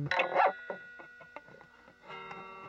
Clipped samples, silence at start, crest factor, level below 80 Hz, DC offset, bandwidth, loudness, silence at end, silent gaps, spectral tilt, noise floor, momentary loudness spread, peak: under 0.1%; 0 s; 22 dB; -74 dBFS; under 0.1%; 7.8 kHz; -32 LUFS; 0 s; none; -5.5 dB/octave; -58 dBFS; 22 LU; -14 dBFS